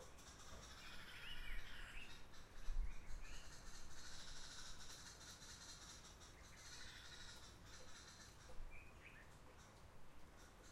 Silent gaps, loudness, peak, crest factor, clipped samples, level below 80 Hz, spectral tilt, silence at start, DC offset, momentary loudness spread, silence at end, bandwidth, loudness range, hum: none; -58 LUFS; -32 dBFS; 20 dB; under 0.1%; -56 dBFS; -2 dB/octave; 0 s; under 0.1%; 10 LU; 0 s; 15 kHz; 4 LU; none